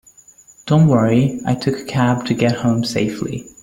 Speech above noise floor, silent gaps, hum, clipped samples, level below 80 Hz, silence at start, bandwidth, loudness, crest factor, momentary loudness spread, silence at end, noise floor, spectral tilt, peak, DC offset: 31 dB; none; none; under 0.1%; -50 dBFS; 0.65 s; 16 kHz; -17 LUFS; 16 dB; 9 LU; 0.15 s; -47 dBFS; -6.5 dB/octave; -2 dBFS; under 0.1%